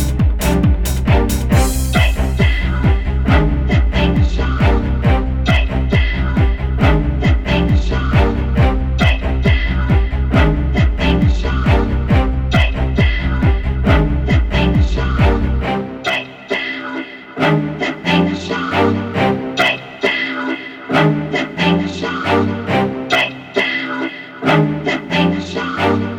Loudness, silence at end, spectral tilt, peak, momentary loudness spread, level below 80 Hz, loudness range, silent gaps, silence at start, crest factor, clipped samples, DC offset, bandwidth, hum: -16 LUFS; 0 s; -6.5 dB/octave; -2 dBFS; 5 LU; -18 dBFS; 2 LU; none; 0 s; 14 dB; under 0.1%; under 0.1%; 17.5 kHz; none